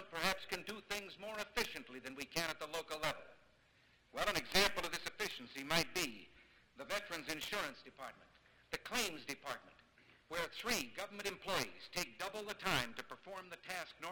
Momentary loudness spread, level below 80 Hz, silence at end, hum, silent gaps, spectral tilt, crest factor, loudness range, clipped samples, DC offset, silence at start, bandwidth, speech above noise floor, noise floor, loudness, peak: 14 LU; -64 dBFS; 0 s; none; none; -2 dB/octave; 26 dB; 5 LU; under 0.1%; under 0.1%; 0 s; 19 kHz; 28 dB; -71 dBFS; -41 LUFS; -16 dBFS